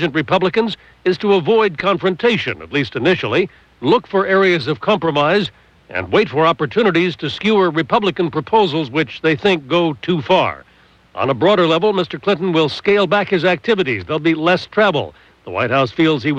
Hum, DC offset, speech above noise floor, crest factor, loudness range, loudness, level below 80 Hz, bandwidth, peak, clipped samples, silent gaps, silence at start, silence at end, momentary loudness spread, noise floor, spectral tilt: none; under 0.1%; 32 dB; 14 dB; 1 LU; -16 LUFS; -52 dBFS; 8.4 kHz; -2 dBFS; under 0.1%; none; 0 s; 0 s; 7 LU; -48 dBFS; -6.5 dB/octave